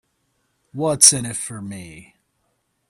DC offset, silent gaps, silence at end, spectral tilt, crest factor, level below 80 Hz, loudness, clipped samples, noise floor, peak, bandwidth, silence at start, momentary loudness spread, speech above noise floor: under 0.1%; none; 0.9 s; -2 dB/octave; 22 dB; -58 dBFS; -15 LUFS; under 0.1%; -70 dBFS; 0 dBFS; 16 kHz; 0.75 s; 24 LU; 50 dB